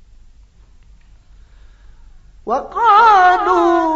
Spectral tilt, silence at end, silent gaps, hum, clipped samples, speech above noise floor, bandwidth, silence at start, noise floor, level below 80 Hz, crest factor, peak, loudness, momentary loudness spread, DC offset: -4 dB/octave; 0 s; none; none; under 0.1%; 33 dB; 7.8 kHz; 2.45 s; -45 dBFS; -42 dBFS; 16 dB; 0 dBFS; -12 LUFS; 14 LU; under 0.1%